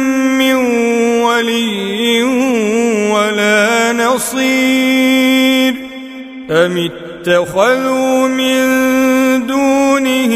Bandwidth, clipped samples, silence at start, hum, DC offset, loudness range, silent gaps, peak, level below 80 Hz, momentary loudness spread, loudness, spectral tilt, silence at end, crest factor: 16 kHz; under 0.1%; 0 s; none; under 0.1%; 2 LU; none; 0 dBFS; -50 dBFS; 6 LU; -12 LUFS; -3.5 dB/octave; 0 s; 12 dB